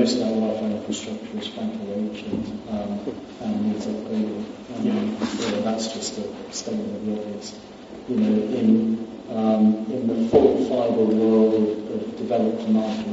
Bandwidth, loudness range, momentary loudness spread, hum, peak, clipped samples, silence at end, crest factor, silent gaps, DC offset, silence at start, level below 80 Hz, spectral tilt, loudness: 8 kHz; 8 LU; 13 LU; none; -4 dBFS; under 0.1%; 0 s; 20 dB; none; under 0.1%; 0 s; -58 dBFS; -6 dB/octave; -23 LUFS